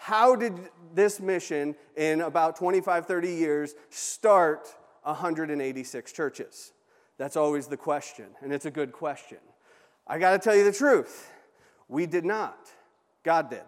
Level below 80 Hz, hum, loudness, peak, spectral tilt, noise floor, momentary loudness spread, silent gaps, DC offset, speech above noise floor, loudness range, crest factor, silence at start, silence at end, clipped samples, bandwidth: -88 dBFS; none; -27 LUFS; -8 dBFS; -4.5 dB/octave; -61 dBFS; 16 LU; none; under 0.1%; 35 dB; 6 LU; 20 dB; 0 s; 0.05 s; under 0.1%; 15.5 kHz